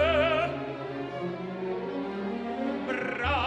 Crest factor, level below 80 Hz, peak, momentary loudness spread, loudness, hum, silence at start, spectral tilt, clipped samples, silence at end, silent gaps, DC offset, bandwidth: 18 dB; -48 dBFS; -12 dBFS; 10 LU; -31 LUFS; none; 0 s; -6.5 dB/octave; under 0.1%; 0 s; none; under 0.1%; 9.4 kHz